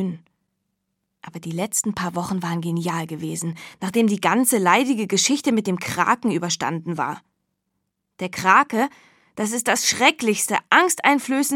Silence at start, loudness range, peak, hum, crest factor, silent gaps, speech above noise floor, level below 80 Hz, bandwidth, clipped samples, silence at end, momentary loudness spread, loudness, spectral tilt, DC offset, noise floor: 0 s; 7 LU; 0 dBFS; none; 22 dB; none; 55 dB; -66 dBFS; 17.5 kHz; under 0.1%; 0 s; 13 LU; -20 LUFS; -3.5 dB/octave; under 0.1%; -76 dBFS